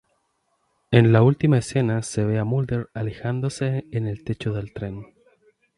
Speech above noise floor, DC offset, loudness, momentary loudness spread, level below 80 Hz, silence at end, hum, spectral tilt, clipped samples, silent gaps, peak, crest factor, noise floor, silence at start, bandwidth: 49 dB; under 0.1%; -22 LUFS; 14 LU; -50 dBFS; 0.75 s; none; -7 dB/octave; under 0.1%; none; 0 dBFS; 22 dB; -70 dBFS; 0.9 s; 11.5 kHz